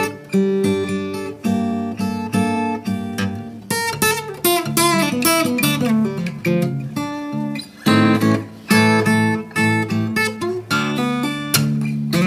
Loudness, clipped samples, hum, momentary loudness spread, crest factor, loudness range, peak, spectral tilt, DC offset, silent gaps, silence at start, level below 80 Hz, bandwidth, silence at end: -19 LUFS; under 0.1%; none; 9 LU; 18 dB; 4 LU; 0 dBFS; -4.5 dB/octave; under 0.1%; none; 0 s; -56 dBFS; 16 kHz; 0 s